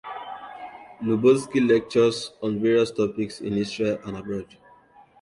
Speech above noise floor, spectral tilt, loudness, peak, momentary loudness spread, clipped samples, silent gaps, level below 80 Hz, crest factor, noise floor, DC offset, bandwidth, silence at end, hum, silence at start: 31 dB; -6 dB/octave; -23 LUFS; -8 dBFS; 18 LU; under 0.1%; none; -60 dBFS; 18 dB; -54 dBFS; under 0.1%; 11.5 kHz; 0.75 s; none; 0.05 s